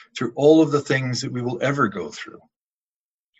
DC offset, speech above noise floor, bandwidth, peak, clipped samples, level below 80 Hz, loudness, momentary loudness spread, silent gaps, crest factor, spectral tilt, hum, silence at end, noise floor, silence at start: under 0.1%; over 69 dB; 8.2 kHz; -2 dBFS; under 0.1%; -64 dBFS; -20 LUFS; 18 LU; none; 20 dB; -6 dB/octave; none; 1.1 s; under -90 dBFS; 0.15 s